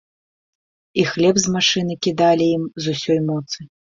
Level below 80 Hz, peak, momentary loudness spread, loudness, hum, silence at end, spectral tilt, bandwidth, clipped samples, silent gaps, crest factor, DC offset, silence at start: -56 dBFS; -2 dBFS; 10 LU; -18 LUFS; none; 0.35 s; -4 dB/octave; 7.8 kHz; under 0.1%; none; 18 dB; under 0.1%; 0.95 s